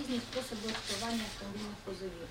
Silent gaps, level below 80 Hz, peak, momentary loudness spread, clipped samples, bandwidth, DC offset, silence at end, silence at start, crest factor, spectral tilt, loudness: none; -56 dBFS; -22 dBFS; 7 LU; under 0.1%; 16.5 kHz; under 0.1%; 0 s; 0 s; 18 dB; -3.5 dB/octave; -38 LUFS